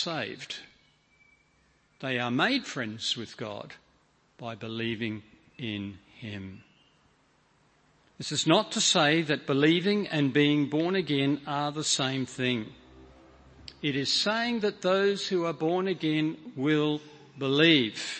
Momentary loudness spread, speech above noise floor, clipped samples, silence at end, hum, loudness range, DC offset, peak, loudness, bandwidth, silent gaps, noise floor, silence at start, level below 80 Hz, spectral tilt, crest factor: 17 LU; 39 dB; under 0.1%; 0 s; none; 12 LU; under 0.1%; -8 dBFS; -27 LUFS; 8.8 kHz; none; -66 dBFS; 0 s; -68 dBFS; -4 dB/octave; 22 dB